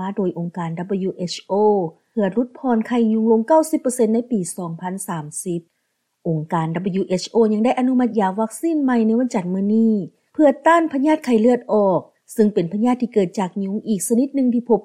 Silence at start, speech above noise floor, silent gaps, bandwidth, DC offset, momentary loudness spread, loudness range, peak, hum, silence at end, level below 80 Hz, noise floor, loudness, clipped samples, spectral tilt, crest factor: 0 s; 53 dB; none; 15 kHz; under 0.1%; 10 LU; 5 LU; -4 dBFS; none; 0.05 s; -66 dBFS; -72 dBFS; -19 LUFS; under 0.1%; -6 dB/octave; 16 dB